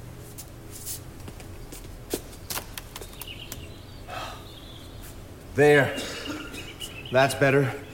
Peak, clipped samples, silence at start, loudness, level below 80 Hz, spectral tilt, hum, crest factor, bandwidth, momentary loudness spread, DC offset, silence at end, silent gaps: -6 dBFS; under 0.1%; 0 s; -26 LUFS; -48 dBFS; -4.5 dB/octave; none; 22 dB; 17 kHz; 22 LU; under 0.1%; 0 s; none